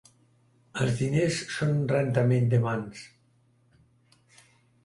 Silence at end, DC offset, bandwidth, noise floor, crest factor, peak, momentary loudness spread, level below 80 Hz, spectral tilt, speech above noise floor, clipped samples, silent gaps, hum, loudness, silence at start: 1.8 s; under 0.1%; 11.5 kHz; -65 dBFS; 18 dB; -10 dBFS; 13 LU; -60 dBFS; -6.5 dB/octave; 40 dB; under 0.1%; none; none; -26 LUFS; 0.75 s